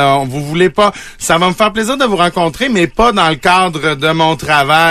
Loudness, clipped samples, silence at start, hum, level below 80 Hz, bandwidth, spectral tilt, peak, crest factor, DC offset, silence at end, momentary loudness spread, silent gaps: -12 LUFS; under 0.1%; 0 s; none; -36 dBFS; 14 kHz; -4.5 dB/octave; 0 dBFS; 12 dB; under 0.1%; 0 s; 4 LU; none